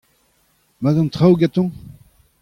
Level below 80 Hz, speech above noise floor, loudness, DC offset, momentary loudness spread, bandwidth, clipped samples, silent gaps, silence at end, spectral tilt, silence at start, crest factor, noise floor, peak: -50 dBFS; 46 dB; -17 LUFS; under 0.1%; 9 LU; 9.8 kHz; under 0.1%; none; 0.55 s; -9 dB/octave; 0.8 s; 16 dB; -61 dBFS; -2 dBFS